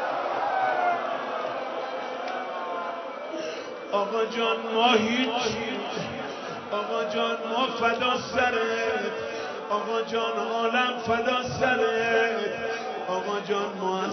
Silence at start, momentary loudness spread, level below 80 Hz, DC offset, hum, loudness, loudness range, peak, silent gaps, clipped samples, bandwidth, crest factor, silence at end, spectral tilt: 0 s; 9 LU; -62 dBFS; under 0.1%; none; -27 LUFS; 4 LU; -8 dBFS; none; under 0.1%; 6.4 kHz; 20 dB; 0 s; -4 dB/octave